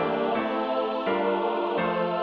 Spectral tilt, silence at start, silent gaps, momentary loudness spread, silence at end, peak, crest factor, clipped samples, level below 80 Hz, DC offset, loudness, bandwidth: -8 dB/octave; 0 s; none; 1 LU; 0 s; -14 dBFS; 12 dB; under 0.1%; -66 dBFS; under 0.1%; -26 LUFS; 6 kHz